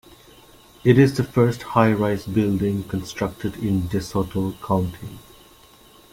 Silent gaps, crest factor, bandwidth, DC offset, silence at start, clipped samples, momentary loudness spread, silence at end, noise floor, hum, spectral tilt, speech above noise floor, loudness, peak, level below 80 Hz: none; 20 dB; 16.5 kHz; under 0.1%; 0.85 s; under 0.1%; 11 LU; 0.95 s; -50 dBFS; none; -7.5 dB/octave; 29 dB; -21 LUFS; -2 dBFS; -48 dBFS